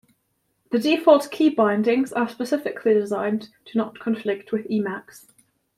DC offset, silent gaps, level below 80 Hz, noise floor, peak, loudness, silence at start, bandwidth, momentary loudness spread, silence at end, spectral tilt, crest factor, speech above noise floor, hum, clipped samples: under 0.1%; none; -70 dBFS; -71 dBFS; -2 dBFS; -22 LUFS; 0.7 s; 15 kHz; 10 LU; 0.6 s; -6 dB/octave; 20 dB; 50 dB; none; under 0.1%